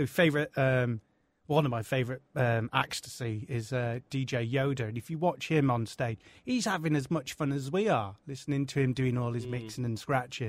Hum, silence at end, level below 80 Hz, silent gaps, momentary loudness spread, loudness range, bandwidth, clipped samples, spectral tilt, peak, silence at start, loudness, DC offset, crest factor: none; 0 s; -62 dBFS; none; 8 LU; 1 LU; 15.5 kHz; under 0.1%; -6 dB/octave; -8 dBFS; 0 s; -31 LUFS; under 0.1%; 22 dB